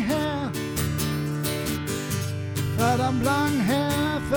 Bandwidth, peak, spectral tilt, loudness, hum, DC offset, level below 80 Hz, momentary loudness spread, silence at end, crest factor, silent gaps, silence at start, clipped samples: over 20 kHz; -10 dBFS; -5 dB/octave; -25 LUFS; none; under 0.1%; -44 dBFS; 6 LU; 0 s; 14 dB; none; 0 s; under 0.1%